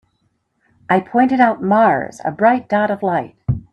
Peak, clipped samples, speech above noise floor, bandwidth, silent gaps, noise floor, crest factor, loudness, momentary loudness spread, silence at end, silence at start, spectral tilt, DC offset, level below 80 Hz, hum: 0 dBFS; under 0.1%; 50 dB; 9 kHz; none; -66 dBFS; 16 dB; -16 LUFS; 9 LU; 0.1 s; 0.9 s; -8 dB/octave; under 0.1%; -44 dBFS; none